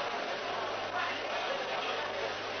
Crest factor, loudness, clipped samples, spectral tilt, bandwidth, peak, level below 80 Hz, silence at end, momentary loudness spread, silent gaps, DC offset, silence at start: 14 dB; -34 LUFS; under 0.1%; 0 dB/octave; 6.4 kHz; -22 dBFS; -70 dBFS; 0 s; 2 LU; none; under 0.1%; 0 s